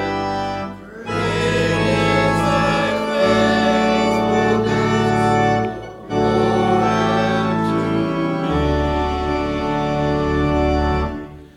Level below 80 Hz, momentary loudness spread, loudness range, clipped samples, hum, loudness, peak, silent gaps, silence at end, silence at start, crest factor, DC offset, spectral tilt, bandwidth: -32 dBFS; 7 LU; 3 LU; under 0.1%; none; -18 LUFS; -4 dBFS; none; 0.1 s; 0 s; 14 dB; under 0.1%; -6 dB/octave; 12.5 kHz